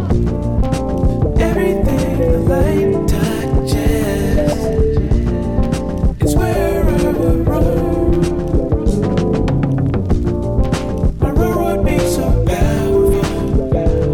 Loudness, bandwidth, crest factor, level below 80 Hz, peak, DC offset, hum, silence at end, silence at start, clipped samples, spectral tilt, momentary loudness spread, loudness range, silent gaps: -16 LUFS; 18 kHz; 10 dB; -20 dBFS; -4 dBFS; under 0.1%; none; 0 s; 0 s; under 0.1%; -7.5 dB/octave; 3 LU; 1 LU; none